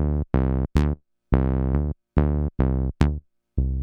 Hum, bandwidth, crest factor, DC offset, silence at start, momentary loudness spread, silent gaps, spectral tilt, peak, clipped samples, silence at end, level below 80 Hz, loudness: none; 6.8 kHz; 20 dB; under 0.1%; 0 s; 5 LU; none; -9.5 dB/octave; -2 dBFS; under 0.1%; 0 s; -26 dBFS; -24 LUFS